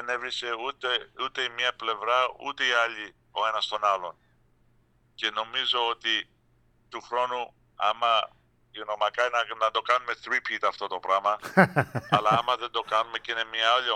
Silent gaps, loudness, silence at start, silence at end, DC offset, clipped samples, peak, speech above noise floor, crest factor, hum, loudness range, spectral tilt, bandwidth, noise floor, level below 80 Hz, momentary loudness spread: none; -26 LUFS; 0 s; 0 s; under 0.1%; under 0.1%; -4 dBFS; 37 dB; 24 dB; none; 4 LU; -4 dB/octave; 15 kHz; -64 dBFS; -68 dBFS; 10 LU